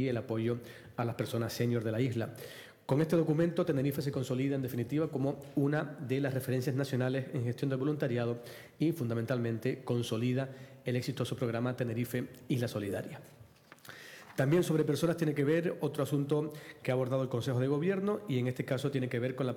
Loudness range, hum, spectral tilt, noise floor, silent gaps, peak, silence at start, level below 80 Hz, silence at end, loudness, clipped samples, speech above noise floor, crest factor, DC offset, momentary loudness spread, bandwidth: 3 LU; none; -7 dB/octave; -57 dBFS; none; -20 dBFS; 0 s; -72 dBFS; 0 s; -33 LUFS; under 0.1%; 25 dB; 14 dB; under 0.1%; 10 LU; 18.5 kHz